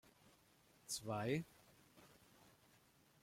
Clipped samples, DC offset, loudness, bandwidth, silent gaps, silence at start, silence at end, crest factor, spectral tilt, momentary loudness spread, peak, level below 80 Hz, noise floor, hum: under 0.1%; under 0.1%; -45 LUFS; 16.5 kHz; none; 0.25 s; 0.75 s; 22 dB; -4.5 dB/octave; 26 LU; -28 dBFS; -80 dBFS; -72 dBFS; none